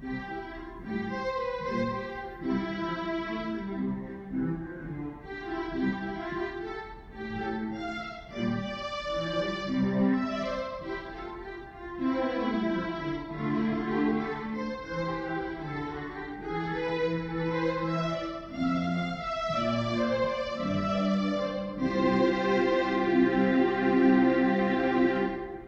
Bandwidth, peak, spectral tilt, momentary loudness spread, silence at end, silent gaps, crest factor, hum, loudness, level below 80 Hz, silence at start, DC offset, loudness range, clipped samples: 7.6 kHz; -12 dBFS; -7 dB/octave; 13 LU; 0 s; none; 18 dB; none; -30 LUFS; -52 dBFS; 0 s; under 0.1%; 9 LU; under 0.1%